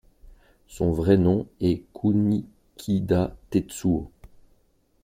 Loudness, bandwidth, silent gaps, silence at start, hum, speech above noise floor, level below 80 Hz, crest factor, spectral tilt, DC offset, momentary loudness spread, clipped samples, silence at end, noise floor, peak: -24 LUFS; 16 kHz; none; 0.7 s; none; 41 dB; -46 dBFS; 20 dB; -8 dB/octave; under 0.1%; 9 LU; under 0.1%; 0.95 s; -64 dBFS; -6 dBFS